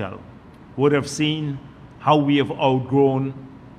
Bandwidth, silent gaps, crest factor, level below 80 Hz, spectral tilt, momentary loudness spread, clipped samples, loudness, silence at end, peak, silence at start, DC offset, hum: 12 kHz; none; 18 dB; -54 dBFS; -6 dB/octave; 17 LU; under 0.1%; -20 LUFS; 0.1 s; -2 dBFS; 0 s; under 0.1%; none